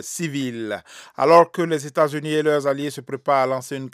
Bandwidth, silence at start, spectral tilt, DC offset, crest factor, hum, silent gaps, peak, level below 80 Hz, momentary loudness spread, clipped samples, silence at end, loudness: 15.5 kHz; 0 s; -5 dB/octave; under 0.1%; 20 dB; none; none; 0 dBFS; -74 dBFS; 14 LU; under 0.1%; 0.05 s; -20 LUFS